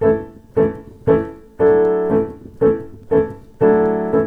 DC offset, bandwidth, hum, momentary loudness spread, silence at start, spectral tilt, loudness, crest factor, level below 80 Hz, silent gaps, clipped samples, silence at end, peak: under 0.1%; 3.3 kHz; none; 10 LU; 0 s; -10 dB/octave; -18 LUFS; 14 dB; -42 dBFS; none; under 0.1%; 0 s; -2 dBFS